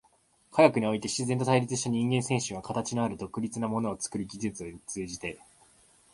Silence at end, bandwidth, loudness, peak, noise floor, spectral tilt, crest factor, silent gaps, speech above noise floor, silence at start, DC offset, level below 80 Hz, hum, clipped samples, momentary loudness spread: 0.8 s; 11.5 kHz; -29 LUFS; -6 dBFS; -66 dBFS; -5 dB/octave; 24 dB; none; 37 dB; 0.55 s; under 0.1%; -62 dBFS; none; under 0.1%; 14 LU